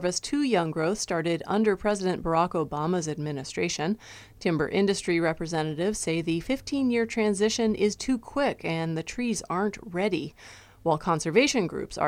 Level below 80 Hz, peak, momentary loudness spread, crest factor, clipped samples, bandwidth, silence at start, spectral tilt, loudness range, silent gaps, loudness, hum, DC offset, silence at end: -52 dBFS; -8 dBFS; 6 LU; 20 dB; under 0.1%; 15.5 kHz; 0 s; -4.5 dB/octave; 2 LU; none; -27 LUFS; none; under 0.1%; 0 s